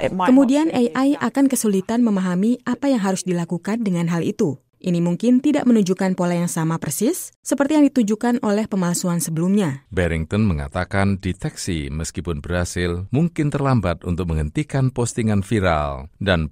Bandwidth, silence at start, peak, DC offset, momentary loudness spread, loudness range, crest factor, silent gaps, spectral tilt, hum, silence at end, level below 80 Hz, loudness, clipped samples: 16 kHz; 0 s; -4 dBFS; under 0.1%; 8 LU; 4 LU; 16 dB; 7.36-7.43 s; -6 dB/octave; none; 0 s; -38 dBFS; -20 LUFS; under 0.1%